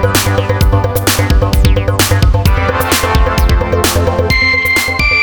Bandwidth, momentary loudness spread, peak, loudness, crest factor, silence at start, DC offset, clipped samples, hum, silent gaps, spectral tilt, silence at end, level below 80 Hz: over 20 kHz; 3 LU; 0 dBFS; -11 LUFS; 10 dB; 0 s; under 0.1%; under 0.1%; none; none; -4.5 dB/octave; 0 s; -16 dBFS